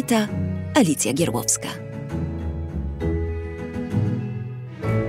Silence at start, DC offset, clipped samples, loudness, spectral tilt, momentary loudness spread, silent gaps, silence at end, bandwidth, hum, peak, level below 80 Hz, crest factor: 0 s; under 0.1%; under 0.1%; -24 LUFS; -5 dB/octave; 11 LU; none; 0 s; 16 kHz; none; -4 dBFS; -36 dBFS; 20 dB